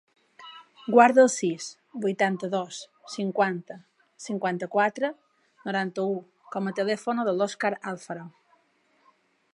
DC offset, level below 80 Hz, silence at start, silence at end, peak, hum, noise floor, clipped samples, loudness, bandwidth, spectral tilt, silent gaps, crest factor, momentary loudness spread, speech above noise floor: under 0.1%; -84 dBFS; 0.4 s; 1.25 s; -4 dBFS; none; -67 dBFS; under 0.1%; -26 LUFS; 11.5 kHz; -4.5 dB/octave; none; 24 dB; 20 LU; 41 dB